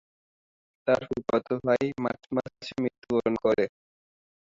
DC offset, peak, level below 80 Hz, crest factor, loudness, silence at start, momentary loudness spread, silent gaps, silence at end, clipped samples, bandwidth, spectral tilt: under 0.1%; -12 dBFS; -62 dBFS; 18 dB; -28 LUFS; 0.85 s; 7 LU; 2.98-3.02 s; 0.8 s; under 0.1%; 7.6 kHz; -7 dB/octave